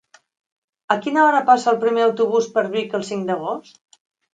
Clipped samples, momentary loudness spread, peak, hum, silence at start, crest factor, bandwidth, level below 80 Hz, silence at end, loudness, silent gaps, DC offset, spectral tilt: under 0.1%; 10 LU; 0 dBFS; none; 0.9 s; 20 dB; 9.2 kHz; -74 dBFS; 0.75 s; -19 LUFS; none; under 0.1%; -4.5 dB/octave